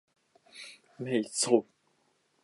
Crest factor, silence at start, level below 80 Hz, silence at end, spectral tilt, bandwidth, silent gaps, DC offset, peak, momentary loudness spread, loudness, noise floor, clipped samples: 24 dB; 0.55 s; -84 dBFS; 0.8 s; -3.5 dB/octave; 11.5 kHz; none; under 0.1%; -8 dBFS; 21 LU; -29 LUFS; -72 dBFS; under 0.1%